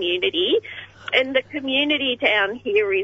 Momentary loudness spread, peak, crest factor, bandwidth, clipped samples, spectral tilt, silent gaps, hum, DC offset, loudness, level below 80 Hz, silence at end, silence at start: 5 LU; -4 dBFS; 18 dB; 8 kHz; under 0.1%; -4.5 dB/octave; none; none; under 0.1%; -20 LUFS; -62 dBFS; 0 s; 0 s